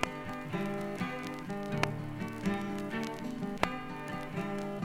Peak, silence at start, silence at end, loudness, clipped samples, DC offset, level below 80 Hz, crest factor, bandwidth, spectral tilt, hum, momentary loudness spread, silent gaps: -6 dBFS; 0 s; 0 s; -37 LUFS; under 0.1%; under 0.1%; -56 dBFS; 30 dB; 17 kHz; -6 dB/octave; none; 6 LU; none